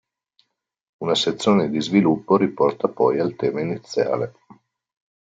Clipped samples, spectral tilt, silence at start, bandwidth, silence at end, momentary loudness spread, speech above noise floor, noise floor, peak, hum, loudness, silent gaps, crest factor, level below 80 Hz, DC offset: under 0.1%; -6 dB/octave; 1 s; 9 kHz; 0.95 s; 8 LU; 46 dB; -66 dBFS; -4 dBFS; none; -21 LUFS; none; 18 dB; -64 dBFS; under 0.1%